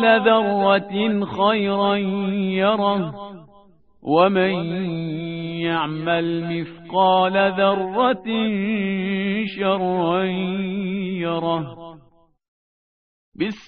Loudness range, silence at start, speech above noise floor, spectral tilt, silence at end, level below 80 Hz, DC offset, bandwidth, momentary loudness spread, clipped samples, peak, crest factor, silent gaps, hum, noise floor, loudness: 4 LU; 0 s; 35 dB; -4 dB/octave; 0.05 s; -60 dBFS; 0.1%; 4.6 kHz; 10 LU; under 0.1%; -2 dBFS; 18 dB; 12.48-13.32 s; none; -55 dBFS; -21 LUFS